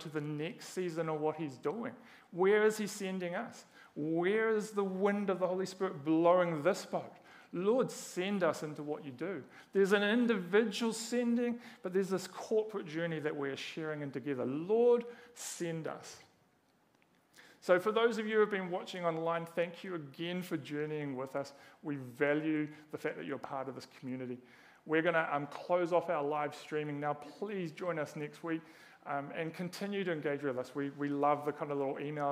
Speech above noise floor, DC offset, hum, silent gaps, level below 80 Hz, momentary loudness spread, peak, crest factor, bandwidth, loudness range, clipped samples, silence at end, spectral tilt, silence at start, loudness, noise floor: 37 dB; under 0.1%; none; none; -88 dBFS; 12 LU; -14 dBFS; 22 dB; 15.5 kHz; 6 LU; under 0.1%; 0 s; -5.5 dB/octave; 0 s; -35 LUFS; -71 dBFS